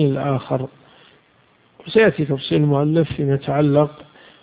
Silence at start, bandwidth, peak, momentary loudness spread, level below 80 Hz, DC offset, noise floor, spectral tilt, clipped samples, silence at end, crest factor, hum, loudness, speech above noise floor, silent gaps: 0 s; 4.9 kHz; -2 dBFS; 8 LU; -52 dBFS; under 0.1%; -56 dBFS; -12.5 dB/octave; under 0.1%; 0.4 s; 18 dB; none; -19 LUFS; 39 dB; none